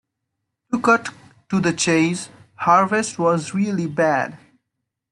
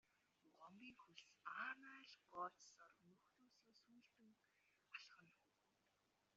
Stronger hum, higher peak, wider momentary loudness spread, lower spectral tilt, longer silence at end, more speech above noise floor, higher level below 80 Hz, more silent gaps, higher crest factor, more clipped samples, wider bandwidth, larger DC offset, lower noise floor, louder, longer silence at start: neither; first, -2 dBFS vs -38 dBFS; second, 12 LU vs 15 LU; first, -5 dB/octave vs -0.5 dB/octave; second, 0.75 s vs 1 s; first, 60 dB vs 27 dB; first, -62 dBFS vs under -90 dBFS; neither; second, 18 dB vs 24 dB; neither; first, 11.5 kHz vs 7.4 kHz; neither; second, -79 dBFS vs -85 dBFS; first, -20 LUFS vs -57 LUFS; first, 0.7 s vs 0.45 s